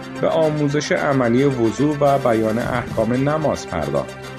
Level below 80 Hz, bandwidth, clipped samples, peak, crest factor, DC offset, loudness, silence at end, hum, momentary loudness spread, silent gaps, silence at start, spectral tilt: -46 dBFS; 13.5 kHz; under 0.1%; -4 dBFS; 16 dB; under 0.1%; -19 LUFS; 0 s; none; 6 LU; none; 0 s; -6.5 dB/octave